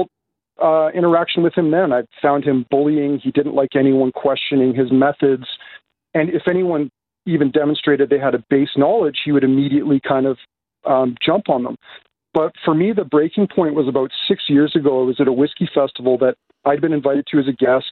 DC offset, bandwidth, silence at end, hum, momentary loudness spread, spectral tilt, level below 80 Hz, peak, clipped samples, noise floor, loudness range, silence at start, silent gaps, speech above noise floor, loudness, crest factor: under 0.1%; 4.4 kHz; 0 s; none; 5 LU; -10 dB/octave; -60 dBFS; -2 dBFS; under 0.1%; -70 dBFS; 2 LU; 0 s; none; 54 dB; -17 LUFS; 14 dB